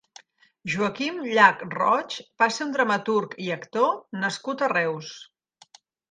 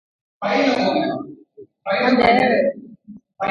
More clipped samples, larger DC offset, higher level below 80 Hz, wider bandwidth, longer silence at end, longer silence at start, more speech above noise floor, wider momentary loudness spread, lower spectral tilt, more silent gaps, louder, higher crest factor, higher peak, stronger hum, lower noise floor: neither; neither; second, -72 dBFS vs -54 dBFS; first, 9.8 kHz vs 8 kHz; first, 0.9 s vs 0 s; first, 0.65 s vs 0.4 s; about the same, 31 dB vs 29 dB; second, 14 LU vs 17 LU; second, -4 dB/octave vs -5.5 dB/octave; neither; second, -24 LUFS vs -18 LUFS; first, 24 dB vs 18 dB; about the same, -2 dBFS vs -2 dBFS; neither; first, -56 dBFS vs -46 dBFS